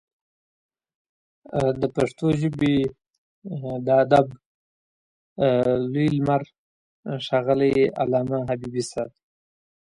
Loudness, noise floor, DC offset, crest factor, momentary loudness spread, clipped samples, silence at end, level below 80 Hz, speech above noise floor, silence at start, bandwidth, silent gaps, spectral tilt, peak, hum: -23 LUFS; under -90 dBFS; under 0.1%; 20 dB; 14 LU; under 0.1%; 0.8 s; -54 dBFS; over 68 dB; 1.5 s; 11.5 kHz; 3.18-3.42 s, 4.46-5.36 s, 6.58-7.03 s; -7 dB/octave; -4 dBFS; none